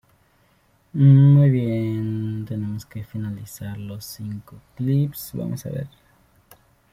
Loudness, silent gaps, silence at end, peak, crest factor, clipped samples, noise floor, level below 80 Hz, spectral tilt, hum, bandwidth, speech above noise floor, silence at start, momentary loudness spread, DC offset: -21 LUFS; none; 1.05 s; -4 dBFS; 18 dB; under 0.1%; -61 dBFS; -56 dBFS; -8.5 dB/octave; none; 15.5 kHz; 41 dB; 0.95 s; 20 LU; under 0.1%